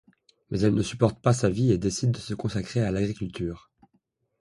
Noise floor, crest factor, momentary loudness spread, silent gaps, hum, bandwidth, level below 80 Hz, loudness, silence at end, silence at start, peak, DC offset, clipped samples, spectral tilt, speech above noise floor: -71 dBFS; 20 dB; 10 LU; none; none; 11.5 kHz; -48 dBFS; -26 LUFS; 0.85 s; 0.5 s; -6 dBFS; under 0.1%; under 0.1%; -6.5 dB/octave; 46 dB